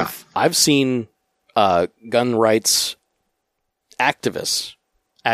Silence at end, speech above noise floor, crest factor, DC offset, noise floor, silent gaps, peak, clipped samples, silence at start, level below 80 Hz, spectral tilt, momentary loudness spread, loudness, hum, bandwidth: 0 s; 57 dB; 20 dB; under 0.1%; -75 dBFS; none; 0 dBFS; under 0.1%; 0 s; -60 dBFS; -3 dB/octave; 11 LU; -19 LUFS; none; 15.5 kHz